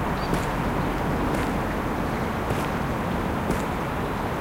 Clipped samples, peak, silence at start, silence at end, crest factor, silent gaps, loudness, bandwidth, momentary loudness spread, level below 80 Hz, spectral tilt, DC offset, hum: under 0.1%; -10 dBFS; 0 s; 0 s; 16 dB; none; -26 LUFS; 17 kHz; 2 LU; -36 dBFS; -6.5 dB/octave; under 0.1%; none